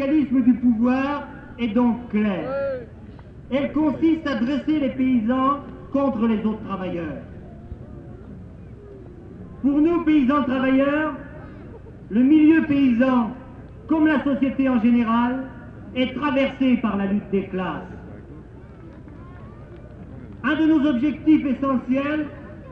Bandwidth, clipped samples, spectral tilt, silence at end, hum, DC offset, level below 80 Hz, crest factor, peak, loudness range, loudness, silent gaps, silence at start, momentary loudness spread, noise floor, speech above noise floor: 5.8 kHz; under 0.1%; -8.5 dB/octave; 0 s; none; under 0.1%; -46 dBFS; 16 dB; -6 dBFS; 8 LU; -21 LUFS; none; 0 s; 23 LU; -41 dBFS; 21 dB